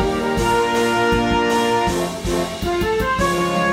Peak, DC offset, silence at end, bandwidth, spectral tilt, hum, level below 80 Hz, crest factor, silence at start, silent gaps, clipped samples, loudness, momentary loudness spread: -6 dBFS; under 0.1%; 0 s; 16 kHz; -4.5 dB/octave; none; -32 dBFS; 12 dB; 0 s; none; under 0.1%; -19 LUFS; 5 LU